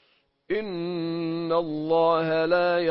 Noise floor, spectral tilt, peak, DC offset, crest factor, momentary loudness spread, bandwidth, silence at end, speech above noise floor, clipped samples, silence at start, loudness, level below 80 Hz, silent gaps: -65 dBFS; -10.5 dB/octave; -10 dBFS; under 0.1%; 14 dB; 8 LU; 5.8 kHz; 0 s; 42 dB; under 0.1%; 0.5 s; -25 LUFS; -64 dBFS; none